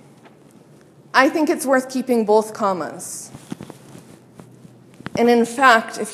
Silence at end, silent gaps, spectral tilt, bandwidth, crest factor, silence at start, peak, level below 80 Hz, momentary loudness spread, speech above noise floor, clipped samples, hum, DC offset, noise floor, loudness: 0 s; none; -4 dB/octave; 15 kHz; 20 dB; 1.15 s; 0 dBFS; -66 dBFS; 22 LU; 30 dB; under 0.1%; none; under 0.1%; -48 dBFS; -18 LUFS